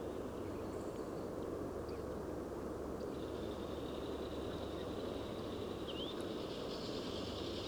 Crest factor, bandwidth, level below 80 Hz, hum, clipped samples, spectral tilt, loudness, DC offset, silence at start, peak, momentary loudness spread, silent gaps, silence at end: 14 dB; over 20 kHz; -58 dBFS; none; under 0.1%; -6 dB/octave; -44 LUFS; under 0.1%; 0 s; -30 dBFS; 2 LU; none; 0 s